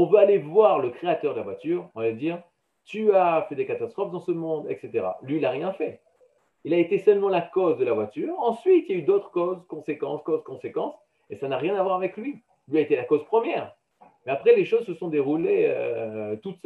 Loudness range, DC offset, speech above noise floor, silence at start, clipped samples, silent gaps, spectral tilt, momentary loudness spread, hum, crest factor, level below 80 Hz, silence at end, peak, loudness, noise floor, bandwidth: 5 LU; under 0.1%; 39 dB; 0 s; under 0.1%; none; -8 dB/octave; 13 LU; none; 20 dB; -78 dBFS; 0.1 s; -6 dBFS; -25 LUFS; -63 dBFS; 4.5 kHz